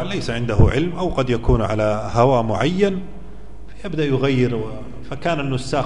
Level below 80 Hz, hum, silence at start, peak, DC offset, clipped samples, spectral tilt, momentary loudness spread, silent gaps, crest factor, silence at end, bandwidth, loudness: -30 dBFS; none; 0 s; 0 dBFS; 3%; under 0.1%; -7 dB/octave; 14 LU; none; 18 dB; 0 s; 10.5 kHz; -20 LUFS